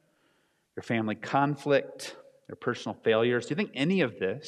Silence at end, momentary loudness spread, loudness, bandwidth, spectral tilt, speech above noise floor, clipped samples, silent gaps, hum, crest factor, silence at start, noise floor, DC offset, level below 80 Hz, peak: 0 s; 16 LU; -28 LUFS; 12.5 kHz; -6 dB/octave; 42 dB; under 0.1%; none; none; 18 dB; 0.75 s; -71 dBFS; under 0.1%; -76 dBFS; -12 dBFS